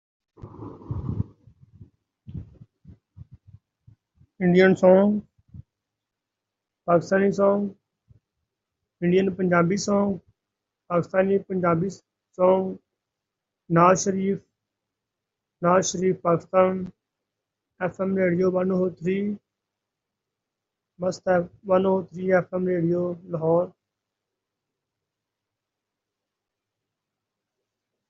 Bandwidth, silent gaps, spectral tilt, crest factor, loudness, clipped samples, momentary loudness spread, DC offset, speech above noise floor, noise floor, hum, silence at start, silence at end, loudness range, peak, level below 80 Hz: 7.8 kHz; none; -6.5 dB/octave; 24 dB; -23 LUFS; under 0.1%; 15 LU; under 0.1%; 64 dB; -85 dBFS; none; 0.45 s; 4.4 s; 6 LU; -2 dBFS; -60 dBFS